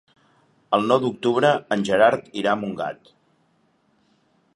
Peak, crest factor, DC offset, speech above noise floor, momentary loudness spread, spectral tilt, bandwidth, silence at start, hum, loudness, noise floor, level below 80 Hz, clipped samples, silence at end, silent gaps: -2 dBFS; 22 dB; under 0.1%; 44 dB; 12 LU; -5.5 dB/octave; 11.5 kHz; 0.7 s; none; -21 LUFS; -64 dBFS; -64 dBFS; under 0.1%; 1.6 s; none